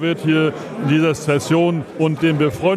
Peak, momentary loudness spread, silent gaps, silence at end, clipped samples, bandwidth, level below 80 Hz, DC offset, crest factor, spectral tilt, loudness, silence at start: -4 dBFS; 4 LU; none; 0 s; under 0.1%; 14 kHz; -52 dBFS; under 0.1%; 14 dB; -6.5 dB/octave; -18 LUFS; 0 s